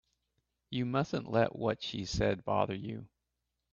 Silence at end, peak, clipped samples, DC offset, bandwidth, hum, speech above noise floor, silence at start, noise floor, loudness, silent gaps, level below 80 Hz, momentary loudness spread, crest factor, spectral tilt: 0.65 s; -14 dBFS; under 0.1%; under 0.1%; 8 kHz; none; 52 dB; 0.7 s; -85 dBFS; -34 LUFS; none; -56 dBFS; 10 LU; 22 dB; -6 dB/octave